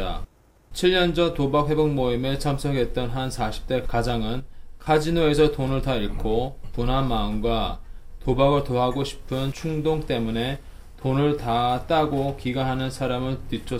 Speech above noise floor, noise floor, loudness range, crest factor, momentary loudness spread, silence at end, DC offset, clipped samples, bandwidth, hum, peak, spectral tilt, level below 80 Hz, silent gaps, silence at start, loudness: 22 dB; -45 dBFS; 2 LU; 16 dB; 10 LU; 0 s; under 0.1%; under 0.1%; 16 kHz; none; -6 dBFS; -6.5 dB/octave; -34 dBFS; none; 0 s; -24 LUFS